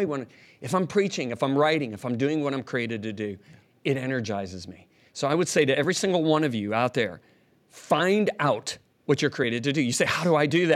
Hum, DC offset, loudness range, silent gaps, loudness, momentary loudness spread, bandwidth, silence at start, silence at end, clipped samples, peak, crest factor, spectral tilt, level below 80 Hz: none; under 0.1%; 5 LU; none; -25 LUFS; 12 LU; 14.5 kHz; 0 s; 0 s; under 0.1%; -8 dBFS; 18 dB; -5 dB/octave; -72 dBFS